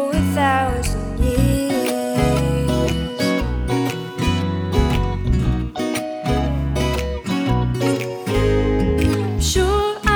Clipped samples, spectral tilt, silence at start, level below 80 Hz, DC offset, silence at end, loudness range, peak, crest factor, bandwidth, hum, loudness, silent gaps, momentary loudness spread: under 0.1%; -5.5 dB/octave; 0 s; -26 dBFS; under 0.1%; 0 s; 2 LU; -2 dBFS; 16 dB; over 20 kHz; none; -20 LUFS; none; 5 LU